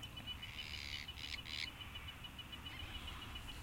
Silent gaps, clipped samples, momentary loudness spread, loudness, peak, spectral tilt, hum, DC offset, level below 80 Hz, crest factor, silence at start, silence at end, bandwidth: none; under 0.1%; 5 LU; -47 LUFS; -28 dBFS; -3 dB/octave; none; under 0.1%; -56 dBFS; 20 dB; 0 s; 0 s; 16.5 kHz